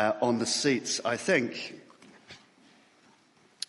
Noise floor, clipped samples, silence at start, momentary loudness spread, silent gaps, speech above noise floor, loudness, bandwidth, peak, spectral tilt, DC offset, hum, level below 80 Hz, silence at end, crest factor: -63 dBFS; under 0.1%; 0 s; 24 LU; none; 34 dB; -28 LUFS; 11.5 kHz; -12 dBFS; -3 dB/octave; under 0.1%; none; -74 dBFS; 1.35 s; 18 dB